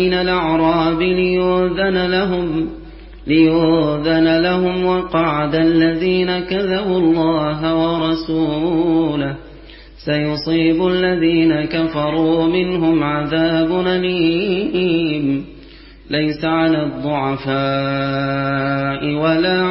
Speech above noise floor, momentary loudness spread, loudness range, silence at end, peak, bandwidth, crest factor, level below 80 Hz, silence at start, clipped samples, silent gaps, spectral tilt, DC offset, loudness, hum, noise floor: 24 dB; 5 LU; 3 LU; 0 s; -2 dBFS; 5.8 kHz; 14 dB; -40 dBFS; 0 s; under 0.1%; none; -11 dB/octave; under 0.1%; -17 LUFS; none; -40 dBFS